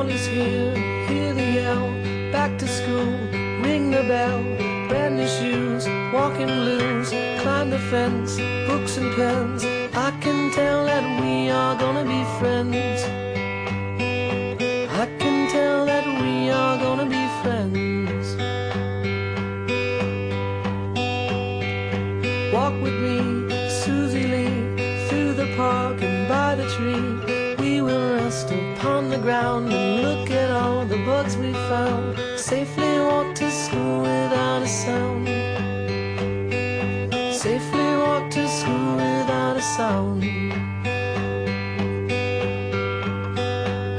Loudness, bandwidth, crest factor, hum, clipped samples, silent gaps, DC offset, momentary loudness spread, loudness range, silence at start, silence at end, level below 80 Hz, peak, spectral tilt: -23 LUFS; 10.5 kHz; 14 dB; none; under 0.1%; none; under 0.1%; 5 LU; 2 LU; 0 s; 0 s; -52 dBFS; -8 dBFS; -5.5 dB/octave